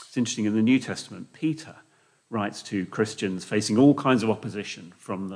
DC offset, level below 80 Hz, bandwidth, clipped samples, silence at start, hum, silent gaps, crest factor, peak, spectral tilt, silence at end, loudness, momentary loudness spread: under 0.1%; -72 dBFS; 10.5 kHz; under 0.1%; 0 s; none; none; 18 dB; -8 dBFS; -5.5 dB/octave; 0 s; -25 LUFS; 16 LU